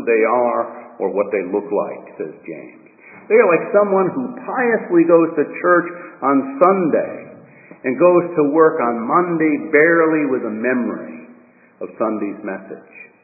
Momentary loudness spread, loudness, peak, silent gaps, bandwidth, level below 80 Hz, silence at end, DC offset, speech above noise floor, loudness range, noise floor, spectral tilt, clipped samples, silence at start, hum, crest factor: 17 LU; -17 LUFS; 0 dBFS; none; 2.7 kHz; -74 dBFS; 0.15 s; under 0.1%; 31 dB; 5 LU; -47 dBFS; -13 dB/octave; under 0.1%; 0 s; none; 18 dB